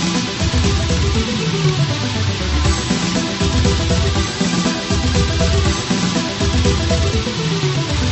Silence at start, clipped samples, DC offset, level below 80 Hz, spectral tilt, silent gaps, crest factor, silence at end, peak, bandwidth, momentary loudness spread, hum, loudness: 0 s; under 0.1%; under 0.1%; -22 dBFS; -4.5 dB/octave; none; 14 dB; 0 s; -2 dBFS; 8.4 kHz; 3 LU; none; -17 LUFS